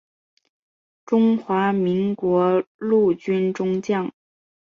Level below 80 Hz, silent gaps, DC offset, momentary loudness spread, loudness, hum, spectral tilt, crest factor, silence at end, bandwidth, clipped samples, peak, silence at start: -64 dBFS; 2.67-2.79 s; under 0.1%; 5 LU; -21 LUFS; none; -8 dB/octave; 14 dB; 0.7 s; 7.2 kHz; under 0.1%; -8 dBFS; 1.1 s